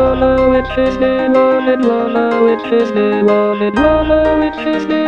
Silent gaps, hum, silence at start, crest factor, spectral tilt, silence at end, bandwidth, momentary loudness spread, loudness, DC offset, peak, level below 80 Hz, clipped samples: none; none; 0 s; 12 dB; -7.5 dB/octave; 0 s; 7.6 kHz; 3 LU; -13 LUFS; 0.3%; 0 dBFS; -30 dBFS; under 0.1%